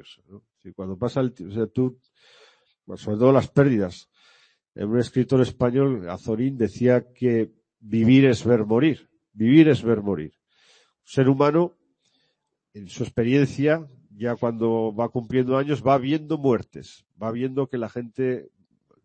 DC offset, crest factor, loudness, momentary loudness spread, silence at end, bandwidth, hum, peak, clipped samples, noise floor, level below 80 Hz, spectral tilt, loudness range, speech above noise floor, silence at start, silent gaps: under 0.1%; 20 dB; -22 LUFS; 13 LU; 0.6 s; 8.8 kHz; none; -4 dBFS; under 0.1%; -75 dBFS; -58 dBFS; -8 dB/octave; 5 LU; 53 dB; 0.35 s; none